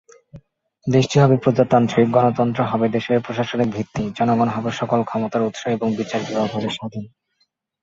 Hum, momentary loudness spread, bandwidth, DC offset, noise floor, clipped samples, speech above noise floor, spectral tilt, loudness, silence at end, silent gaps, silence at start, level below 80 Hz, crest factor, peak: none; 10 LU; 7.8 kHz; under 0.1%; -68 dBFS; under 0.1%; 49 dB; -7 dB/octave; -19 LUFS; 0.75 s; none; 0.35 s; -54 dBFS; 18 dB; -2 dBFS